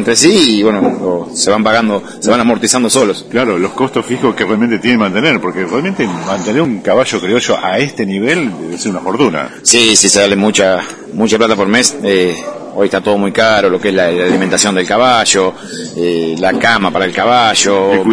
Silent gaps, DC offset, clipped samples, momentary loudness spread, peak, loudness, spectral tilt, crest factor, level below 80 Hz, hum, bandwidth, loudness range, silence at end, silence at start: none; under 0.1%; 0.1%; 8 LU; 0 dBFS; -11 LUFS; -3 dB/octave; 12 dB; -50 dBFS; none; 11 kHz; 4 LU; 0 s; 0 s